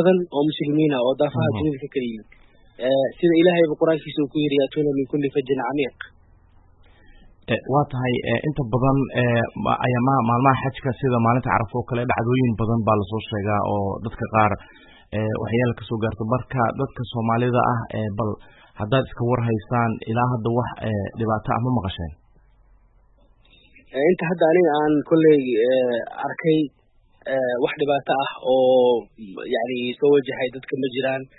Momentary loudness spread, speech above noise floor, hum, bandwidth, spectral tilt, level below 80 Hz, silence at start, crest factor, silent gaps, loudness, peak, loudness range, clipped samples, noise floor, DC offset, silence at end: 10 LU; 35 dB; none; 4.1 kHz; -12 dB/octave; -48 dBFS; 0 s; 20 dB; none; -22 LUFS; -2 dBFS; 5 LU; under 0.1%; -55 dBFS; under 0.1%; 0.15 s